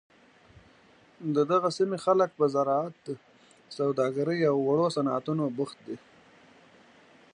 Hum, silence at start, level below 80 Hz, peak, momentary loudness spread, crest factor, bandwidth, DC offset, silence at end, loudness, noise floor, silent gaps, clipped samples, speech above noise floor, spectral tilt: none; 1.2 s; -74 dBFS; -12 dBFS; 16 LU; 18 dB; 10.5 kHz; under 0.1%; 1.35 s; -27 LUFS; -59 dBFS; none; under 0.1%; 32 dB; -6.5 dB/octave